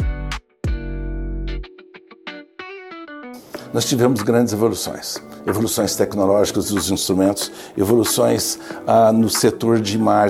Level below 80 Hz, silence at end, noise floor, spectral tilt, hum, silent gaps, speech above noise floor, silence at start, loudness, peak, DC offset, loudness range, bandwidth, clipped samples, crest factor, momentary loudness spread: -34 dBFS; 0 s; -44 dBFS; -4.5 dB/octave; none; none; 27 dB; 0 s; -19 LUFS; -2 dBFS; under 0.1%; 13 LU; 16.5 kHz; under 0.1%; 16 dB; 19 LU